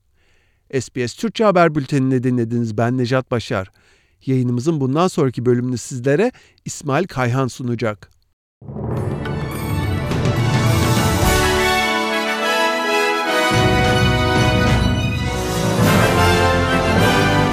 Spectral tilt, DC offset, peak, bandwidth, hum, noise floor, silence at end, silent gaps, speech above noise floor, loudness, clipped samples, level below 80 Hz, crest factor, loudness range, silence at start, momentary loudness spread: -5.5 dB/octave; under 0.1%; -2 dBFS; 16 kHz; none; -57 dBFS; 0 s; 8.33-8.61 s; 39 dB; -17 LUFS; under 0.1%; -34 dBFS; 16 dB; 6 LU; 0.75 s; 10 LU